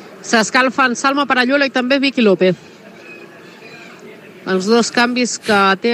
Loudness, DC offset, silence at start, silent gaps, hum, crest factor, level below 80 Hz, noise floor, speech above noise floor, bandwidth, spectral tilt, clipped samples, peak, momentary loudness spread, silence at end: -14 LUFS; under 0.1%; 0 s; none; none; 16 dB; -66 dBFS; -38 dBFS; 23 dB; 13.5 kHz; -3.5 dB/octave; under 0.1%; 0 dBFS; 23 LU; 0 s